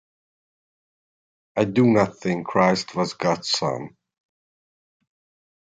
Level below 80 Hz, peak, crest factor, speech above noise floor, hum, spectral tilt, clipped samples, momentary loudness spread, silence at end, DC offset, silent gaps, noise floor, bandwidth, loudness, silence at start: -62 dBFS; -4 dBFS; 20 dB; over 69 dB; none; -5.5 dB/octave; under 0.1%; 11 LU; 1.85 s; under 0.1%; none; under -90 dBFS; 9.4 kHz; -22 LUFS; 1.55 s